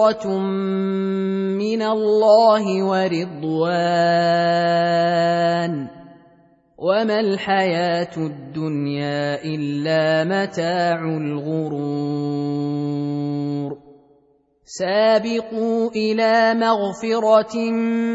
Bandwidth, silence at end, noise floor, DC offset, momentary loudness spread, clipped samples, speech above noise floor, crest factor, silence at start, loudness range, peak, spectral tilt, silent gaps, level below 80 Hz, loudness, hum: 8 kHz; 0 s; -59 dBFS; under 0.1%; 8 LU; under 0.1%; 40 dB; 16 dB; 0 s; 5 LU; -4 dBFS; -6.5 dB/octave; none; -66 dBFS; -20 LUFS; none